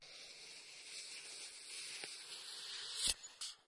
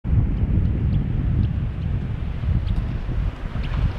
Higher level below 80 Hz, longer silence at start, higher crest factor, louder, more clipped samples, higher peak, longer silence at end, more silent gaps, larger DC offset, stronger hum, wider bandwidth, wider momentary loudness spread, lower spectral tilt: second, -70 dBFS vs -24 dBFS; about the same, 0 s vs 0.05 s; first, 28 dB vs 14 dB; second, -45 LUFS vs -24 LUFS; neither; second, -20 dBFS vs -8 dBFS; about the same, 0.05 s vs 0 s; neither; neither; neither; first, 12 kHz vs 5.6 kHz; first, 14 LU vs 6 LU; second, 1.5 dB/octave vs -9.5 dB/octave